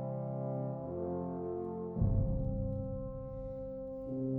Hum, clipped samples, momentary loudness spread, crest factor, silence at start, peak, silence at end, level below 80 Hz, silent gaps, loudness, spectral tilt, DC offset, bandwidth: none; under 0.1%; 9 LU; 18 dB; 0 s; -18 dBFS; 0 s; -44 dBFS; none; -38 LUFS; -13.5 dB/octave; under 0.1%; 2.3 kHz